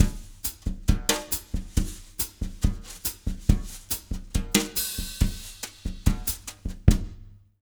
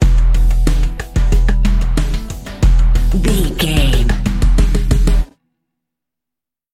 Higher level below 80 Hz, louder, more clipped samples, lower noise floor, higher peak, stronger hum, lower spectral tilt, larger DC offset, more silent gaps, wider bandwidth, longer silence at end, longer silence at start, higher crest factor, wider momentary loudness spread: second, -30 dBFS vs -12 dBFS; second, -28 LUFS vs -16 LUFS; neither; second, -46 dBFS vs -86 dBFS; about the same, -2 dBFS vs 0 dBFS; neither; second, -4 dB/octave vs -5.5 dB/octave; neither; neither; first, over 20 kHz vs 13.5 kHz; second, 0.3 s vs 1.5 s; about the same, 0 s vs 0 s; first, 26 dB vs 12 dB; first, 10 LU vs 6 LU